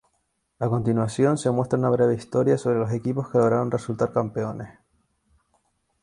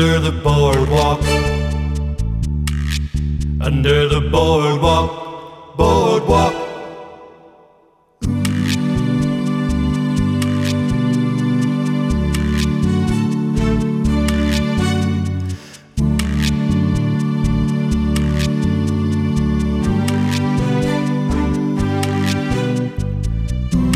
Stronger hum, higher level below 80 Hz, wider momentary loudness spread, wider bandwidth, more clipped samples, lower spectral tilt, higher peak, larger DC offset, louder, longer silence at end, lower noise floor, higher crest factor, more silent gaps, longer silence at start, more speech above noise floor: neither; second, -58 dBFS vs -26 dBFS; about the same, 9 LU vs 7 LU; second, 11 kHz vs 15 kHz; neither; about the same, -7.5 dB/octave vs -6.5 dB/octave; second, -6 dBFS vs -2 dBFS; neither; second, -23 LUFS vs -17 LUFS; first, 1.3 s vs 0 s; first, -73 dBFS vs -53 dBFS; about the same, 18 dB vs 16 dB; neither; first, 0.6 s vs 0 s; first, 50 dB vs 39 dB